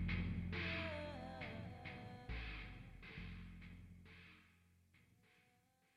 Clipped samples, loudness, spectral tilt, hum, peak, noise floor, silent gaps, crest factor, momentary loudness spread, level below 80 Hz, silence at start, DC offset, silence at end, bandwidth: under 0.1%; -49 LUFS; -7 dB/octave; none; -32 dBFS; -77 dBFS; none; 18 dB; 17 LU; -56 dBFS; 0 s; under 0.1%; 0.55 s; 10.5 kHz